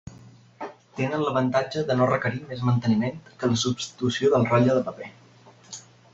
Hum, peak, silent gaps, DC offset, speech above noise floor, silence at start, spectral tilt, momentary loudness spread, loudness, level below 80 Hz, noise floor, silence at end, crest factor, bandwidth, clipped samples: none; -6 dBFS; none; under 0.1%; 28 dB; 0.05 s; -6 dB/octave; 20 LU; -24 LUFS; -60 dBFS; -52 dBFS; 0.35 s; 20 dB; 7.8 kHz; under 0.1%